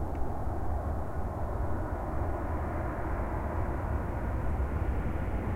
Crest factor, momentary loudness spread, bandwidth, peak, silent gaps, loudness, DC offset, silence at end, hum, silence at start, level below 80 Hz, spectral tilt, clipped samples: 12 dB; 3 LU; 14 kHz; -18 dBFS; none; -35 LUFS; under 0.1%; 0 s; none; 0 s; -36 dBFS; -9 dB/octave; under 0.1%